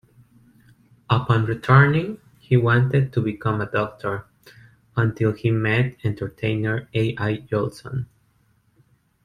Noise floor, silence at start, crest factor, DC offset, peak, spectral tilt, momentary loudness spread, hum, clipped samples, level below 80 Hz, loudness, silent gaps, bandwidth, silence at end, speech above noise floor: -62 dBFS; 1.1 s; 20 dB; under 0.1%; -4 dBFS; -8.5 dB/octave; 13 LU; none; under 0.1%; -52 dBFS; -22 LUFS; none; 10 kHz; 1.2 s; 42 dB